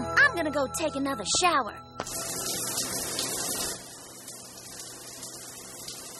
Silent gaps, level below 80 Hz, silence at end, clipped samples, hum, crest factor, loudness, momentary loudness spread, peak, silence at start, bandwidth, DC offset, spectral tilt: none; -58 dBFS; 0 s; under 0.1%; none; 20 dB; -28 LUFS; 18 LU; -10 dBFS; 0 s; 13.5 kHz; under 0.1%; -1.5 dB/octave